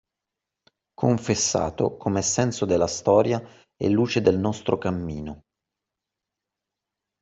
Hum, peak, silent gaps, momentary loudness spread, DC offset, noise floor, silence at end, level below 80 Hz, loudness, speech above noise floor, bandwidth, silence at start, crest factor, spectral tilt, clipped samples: none; -4 dBFS; none; 9 LU; under 0.1%; -86 dBFS; 1.85 s; -54 dBFS; -23 LUFS; 63 dB; 8.2 kHz; 1 s; 20 dB; -5 dB/octave; under 0.1%